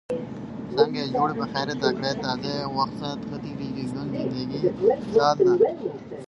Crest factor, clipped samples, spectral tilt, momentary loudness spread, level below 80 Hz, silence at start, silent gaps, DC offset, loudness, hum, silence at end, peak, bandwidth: 20 dB; under 0.1%; -6 dB/octave; 13 LU; -56 dBFS; 0.1 s; none; under 0.1%; -25 LUFS; none; 0.05 s; -6 dBFS; 10.5 kHz